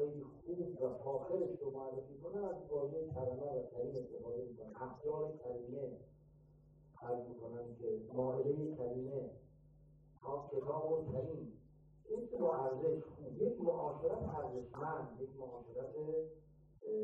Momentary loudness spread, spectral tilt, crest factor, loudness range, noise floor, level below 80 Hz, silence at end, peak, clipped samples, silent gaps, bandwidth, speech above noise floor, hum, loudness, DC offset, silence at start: 11 LU; -11 dB/octave; 18 dB; 6 LU; -65 dBFS; -68 dBFS; 0 s; -24 dBFS; under 0.1%; none; 5.6 kHz; 23 dB; none; -43 LUFS; under 0.1%; 0 s